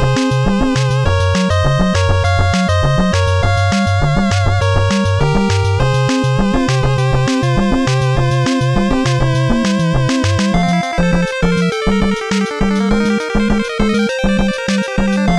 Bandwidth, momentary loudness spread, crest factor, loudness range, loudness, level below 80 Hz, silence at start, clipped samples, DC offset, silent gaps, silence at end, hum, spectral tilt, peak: 11.5 kHz; 2 LU; 14 dB; 1 LU; -14 LUFS; -24 dBFS; 0 s; under 0.1%; under 0.1%; none; 0 s; none; -6 dB/octave; 0 dBFS